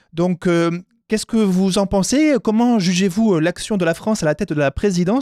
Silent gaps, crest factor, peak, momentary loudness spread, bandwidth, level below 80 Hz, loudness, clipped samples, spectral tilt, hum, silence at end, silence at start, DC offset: none; 12 dB; -4 dBFS; 5 LU; 13.5 kHz; -42 dBFS; -18 LUFS; under 0.1%; -5.5 dB/octave; none; 0 s; 0.15 s; under 0.1%